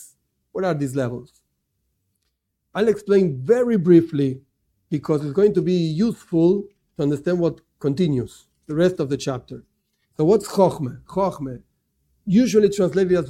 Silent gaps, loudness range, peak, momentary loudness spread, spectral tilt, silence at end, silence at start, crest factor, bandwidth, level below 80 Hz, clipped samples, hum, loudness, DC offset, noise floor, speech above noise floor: none; 4 LU; -2 dBFS; 16 LU; -7.5 dB/octave; 0 s; 0 s; 20 dB; 14 kHz; -56 dBFS; under 0.1%; none; -20 LUFS; under 0.1%; -74 dBFS; 55 dB